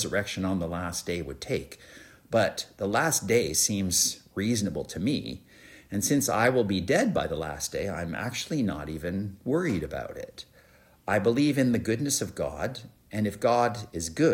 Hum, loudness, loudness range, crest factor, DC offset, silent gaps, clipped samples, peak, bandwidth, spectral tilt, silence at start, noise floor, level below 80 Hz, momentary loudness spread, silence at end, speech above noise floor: none; -28 LUFS; 4 LU; 18 dB; under 0.1%; none; under 0.1%; -10 dBFS; 16.5 kHz; -4 dB/octave; 0 s; -58 dBFS; -52 dBFS; 12 LU; 0 s; 30 dB